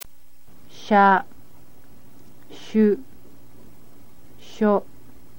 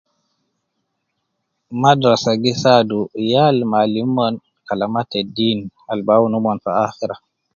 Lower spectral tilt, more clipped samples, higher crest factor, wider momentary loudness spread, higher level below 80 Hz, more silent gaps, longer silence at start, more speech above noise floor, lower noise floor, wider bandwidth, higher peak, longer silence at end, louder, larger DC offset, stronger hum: about the same, -6.5 dB/octave vs -6 dB/octave; neither; about the same, 20 dB vs 18 dB; first, 27 LU vs 12 LU; about the same, -60 dBFS vs -58 dBFS; neither; second, 0 s vs 1.7 s; second, 38 dB vs 57 dB; second, -56 dBFS vs -73 dBFS; first, 17 kHz vs 7.4 kHz; second, -4 dBFS vs 0 dBFS; first, 0.55 s vs 0.4 s; second, -20 LUFS vs -17 LUFS; first, 2% vs under 0.1%; neither